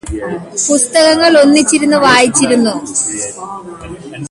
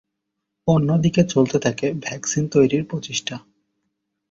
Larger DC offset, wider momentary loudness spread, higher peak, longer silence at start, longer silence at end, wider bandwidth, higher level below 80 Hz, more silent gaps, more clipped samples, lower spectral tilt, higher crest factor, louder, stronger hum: neither; first, 20 LU vs 9 LU; first, 0 dBFS vs -4 dBFS; second, 0.05 s vs 0.65 s; second, 0.05 s vs 0.9 s; first, 11.5 kHz vs 7.8 kHz; first, -38 dBFS vs -54 dBFS; neither; neither; second, -2.5 dB/octave vs -5.5 dB/octave; second, 12 dB vs 18 dB; first, -10 LUFS vs -20 LUFS; neither